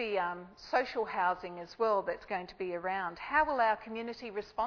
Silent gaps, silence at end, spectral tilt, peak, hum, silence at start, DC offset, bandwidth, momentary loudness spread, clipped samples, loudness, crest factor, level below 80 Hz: none; 0 s; -5 dB/octave; -16 dBFS; none; 0 s; under 0.1%; 5.4 kHz; 10 LU; under 0.1%; -34 LUFS; 18 dB; -64 dBFS